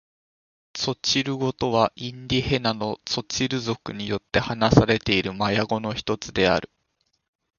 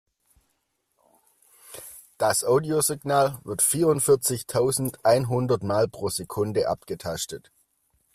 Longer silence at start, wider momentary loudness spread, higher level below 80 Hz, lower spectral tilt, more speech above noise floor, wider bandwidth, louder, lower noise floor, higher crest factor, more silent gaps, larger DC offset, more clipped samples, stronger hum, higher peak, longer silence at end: second, 0.75 s vs 1.7 s; second, 10 LU vs 14 LU; first, -46 dBFS vs -60 dBFS; about the same, -5 dB/octave vs -4.5 dB/octave; about the same, 49 dB vs 50 dB; second, 7.4 kHz vs 16 kHz; about the same, -23 LUFS vs -24 LUFS; about the same, -72 dBFS vs -74 dBFS; first, 24 dB vs 18 dB; neither; neither; neither; neither; first, 0 dBFS vs -8 dBFS; first, 0.95 s vs 0.75 s